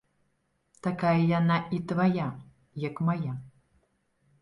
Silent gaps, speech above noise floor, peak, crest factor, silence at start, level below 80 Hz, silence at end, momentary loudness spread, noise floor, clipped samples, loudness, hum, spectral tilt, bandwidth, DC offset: none; 47 dB; -14 dBFS; 16 dB; 0.85 s; -66 dBFS; 0.9 s; 13 LU; -74 dBFS; under 0.1%; -28 LUFS; none; -8.5 dB/octave; 7.2 kHz; under 0.1%